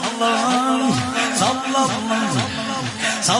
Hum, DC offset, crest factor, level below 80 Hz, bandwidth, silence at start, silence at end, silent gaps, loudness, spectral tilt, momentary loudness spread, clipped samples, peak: none; under 0.1%; 16 dB; -56 dBFS; 11.5 kHz; 0 s; 0 s; none; -19 LUFS; -3 dB/octave; 4 LU; under 0.1%; -4 dBFS